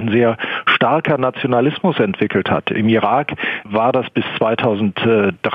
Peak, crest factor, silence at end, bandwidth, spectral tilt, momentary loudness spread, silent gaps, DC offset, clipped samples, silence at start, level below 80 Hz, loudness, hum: -2 dBFS; 14 dB; 0 s; 5.4 kHz; -8.5 dB/octave; 4 LU; none; under 0.1%; under 0.1%; 0 s; -56 dBFS; -16 LUFS; none